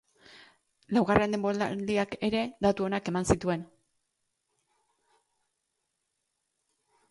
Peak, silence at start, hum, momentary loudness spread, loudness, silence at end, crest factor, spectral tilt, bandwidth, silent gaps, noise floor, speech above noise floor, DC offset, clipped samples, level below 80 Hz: -6 dBFS; 0.35 s; none; 5 LU; -29 LUFS; 3.45 s; 24 dB; -5.5 dB/octave; 11.5 kHz; none; -81 dBFS; 53 dB; under 0.1%; under 0.1%; -54 dBFS